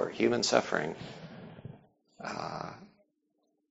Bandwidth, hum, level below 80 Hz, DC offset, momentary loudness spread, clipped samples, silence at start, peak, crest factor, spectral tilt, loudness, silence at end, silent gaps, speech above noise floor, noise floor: 8 kHz; none; -68 dBFS; under 0.1%; 21 LU; under 0.1%; 0 s; -8 dBFS; 28 dB; -3 dB/octave; -31 LUFS; 0.85 s; none; 48 dB; -78 dBFS